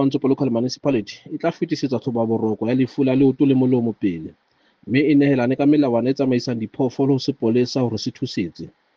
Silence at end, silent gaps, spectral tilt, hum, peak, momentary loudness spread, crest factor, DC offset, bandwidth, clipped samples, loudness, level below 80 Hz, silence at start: 0.25 s; none; -7 dB/octave; none; -4 dBFS; 9 LU; 16 dB; under 0.1%; 7.2 kHz; under 0.1%; -20 LUFS; -62 dBFS; 0 s